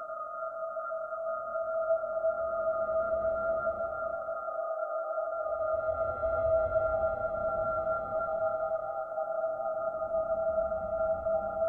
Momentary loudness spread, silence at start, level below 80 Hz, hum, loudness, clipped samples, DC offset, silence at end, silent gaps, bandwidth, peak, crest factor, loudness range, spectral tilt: 6 LU; 0 s; -54 dBFS; none; -32 LUFS; under 0.1%; under 0.1%; 0 s; none; 2.2 kHz; -18 dBFS; 14 dB; 2 LU; -9.5 dB/octave